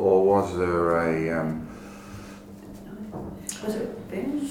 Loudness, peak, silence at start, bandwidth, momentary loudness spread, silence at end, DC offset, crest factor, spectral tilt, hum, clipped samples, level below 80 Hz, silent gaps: -26 LUFS; -8 dBFS; 0 s; 17 kHz; 20 LU; 0 s; under 0.1%; 18 dB; -6 dB/octave; none; under 0.1%; -52 dBFS; none